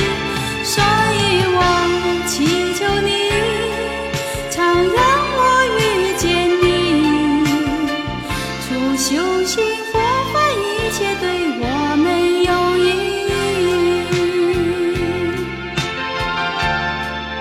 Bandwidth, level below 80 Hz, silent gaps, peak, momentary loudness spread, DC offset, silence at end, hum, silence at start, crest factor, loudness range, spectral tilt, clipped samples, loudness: 16 kHz; -36 dBFS; none; -2 dBFS; 8 LU; under 0.1%; 0 s; none; 0 s; 14 dB; 3 LU; -4 dB/octave; under 0.1%; -17 LUFS